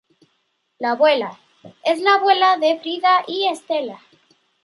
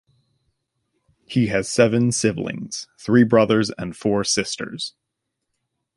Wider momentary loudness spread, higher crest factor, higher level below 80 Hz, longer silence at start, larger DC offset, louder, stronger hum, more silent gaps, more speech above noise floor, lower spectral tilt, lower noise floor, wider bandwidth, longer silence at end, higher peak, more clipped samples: second, 11 LU vs 14 LU; about the same, 16 dB vs 20 dB; second, -78 dBFS vs -54 dBFS; second, 0.8 s vs 1.3 s; neither; about the same, -18 LUFS vs -20 LUFS; neither; neither; second, 51 dB vs 59 dB; second, -3 dB/octave vs -5 dB/octave; second, -69 dBFS vs -79 dBFS; about the same, 11.5 kHz vs 11.5 kHz; second, 0.65 s vs 1.05 s; about the same, -4 dBFS vs -2 dBFS; neither